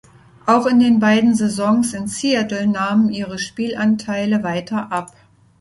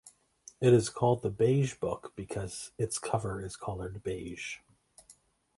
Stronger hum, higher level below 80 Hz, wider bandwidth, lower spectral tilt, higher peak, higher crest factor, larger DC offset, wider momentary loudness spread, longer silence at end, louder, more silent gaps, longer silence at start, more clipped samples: neither; about the same, -56 dBFS vs -56 dBFS; about the same, 11.5 kHz vs 11.5 kHz; about the same, -5 dB/octave vs -6 dB/octave; first, -2 dBFS vs -12 dBFS; about the same, 16 dB vs 20 dB; neither; second, 10 LU vs 15 LU; about the same, 0.55 s vs 0.45 s; first, -18 LUFS vs -32 LUFS; neither; first, 0.45 s vs 0.05 s; neither